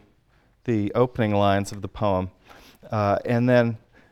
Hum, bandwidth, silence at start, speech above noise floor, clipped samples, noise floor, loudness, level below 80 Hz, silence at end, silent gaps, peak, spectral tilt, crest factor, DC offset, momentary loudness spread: none; 13 kHz; 0.65 s; 39 dB; under 0.1%; -61 dBFS; -23 LUFS; -52 dBFS; 0.35 s; none; -6 dBFS; -7.5 dB/octave; 18 dB; under 0.1%; 13 LU